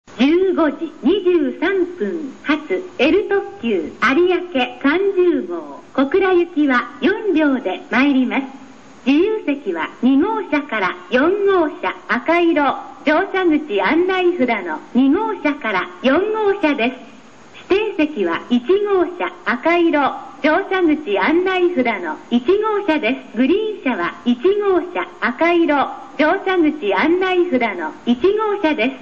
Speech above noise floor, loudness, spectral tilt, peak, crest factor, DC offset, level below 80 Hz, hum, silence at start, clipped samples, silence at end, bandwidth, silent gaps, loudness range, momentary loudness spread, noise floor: 25 dB; -17 LUFS; -5.5 dB/octave; -2 dBFS; 14 dB; 0.5%; -54 dBFS; none; 0.1 s; under 0.1%; 0 s; 7.2 kHz; none; 2 LU; 6 LU; -42 dBFS